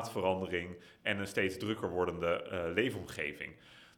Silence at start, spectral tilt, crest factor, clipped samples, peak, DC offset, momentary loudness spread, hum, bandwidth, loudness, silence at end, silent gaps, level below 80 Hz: 0 s; -5 dB/octave; 22 dB; under 0.1%; -14 dBFS; under 0.1%; 9 LU; none; 19 kHz; -36 LUFS; 0.1 s; none; -68 dBFS